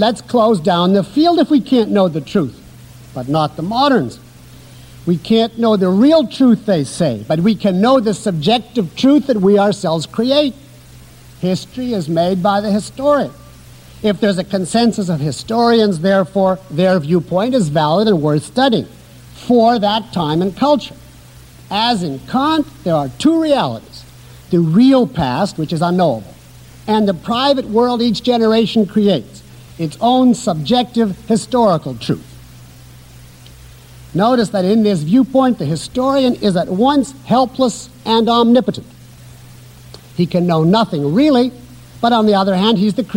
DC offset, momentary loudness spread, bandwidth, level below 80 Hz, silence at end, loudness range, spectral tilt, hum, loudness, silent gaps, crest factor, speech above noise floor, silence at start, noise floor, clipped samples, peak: under 0.1%; 8 LU; 16.5 kHz; -46 dBFS; 0 s; 4 LU; -6.5 dB/octave; none; -15 LUFS; none; 12 dB; 26 dB; 0 s; -40 dBFS; under 0.1%; -2 dBFS